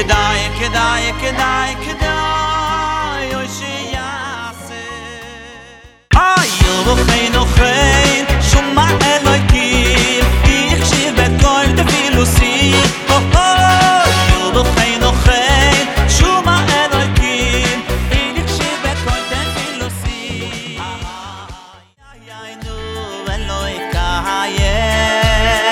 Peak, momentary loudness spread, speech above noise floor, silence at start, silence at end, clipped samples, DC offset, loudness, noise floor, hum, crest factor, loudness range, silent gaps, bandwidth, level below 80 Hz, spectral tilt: 0 dBFS; 15 LU; 30 dB; 0 s; 0 s; under 0.1%; under 0.1%; -13 LUFS; -42 dBFS; none; 14 dB; 12 LU; none; 17.5 kHz; -20 dBFS; -4 dB/octave